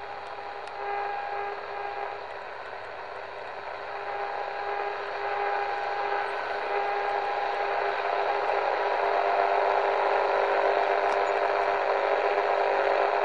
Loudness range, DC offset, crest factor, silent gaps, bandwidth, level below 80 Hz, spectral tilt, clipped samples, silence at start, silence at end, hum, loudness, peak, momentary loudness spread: 10 LU; 0.3%; 16 dB; none; 10.5 kHz; -68 dBFS; -3.5 dB/octave; under 0.1%; 0 s; 0 s; none; -28 LUFS; -12 dBFS; 13 LU